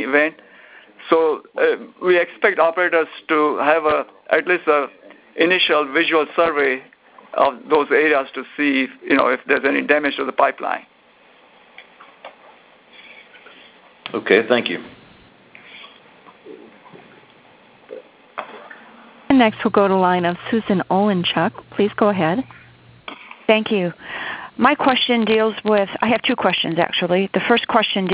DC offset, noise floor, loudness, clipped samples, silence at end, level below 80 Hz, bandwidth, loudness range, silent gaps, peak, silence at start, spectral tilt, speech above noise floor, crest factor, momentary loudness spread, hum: under 0.1%; -51 dBFS; -18 LUFS; under 0.1%; 0 s; -60 dBFS; 4 kHz; 8 LU; none; 0 dBFS; 0 s; -9 dB/octave; 34 dB; 20 dB; 15 LU; none